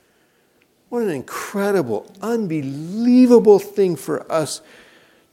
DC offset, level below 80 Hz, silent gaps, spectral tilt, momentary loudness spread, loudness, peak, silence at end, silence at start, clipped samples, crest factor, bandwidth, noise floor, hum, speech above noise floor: under 0.1%; -66 dBFS; none; -6 dB/octave; 15 LU; -18 LUFS; 0 dBFS; 0.75 s; 0.9 s; under 0.1%; 18 dB; 16 kHz; -60 dBFS; none; 42 dB